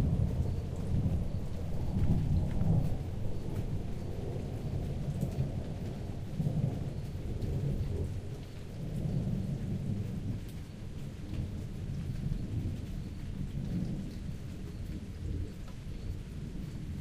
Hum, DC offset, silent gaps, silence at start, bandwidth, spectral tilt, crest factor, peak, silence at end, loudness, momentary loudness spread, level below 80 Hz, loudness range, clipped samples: none; under 0.1%; none; 0 s; 15 kHz; -8.5 dB/octave; 18 dB; -18 dBFS; 0 s; -37 LUFS; 10 LU; -40 dBFS; 6 LU; under 0.1%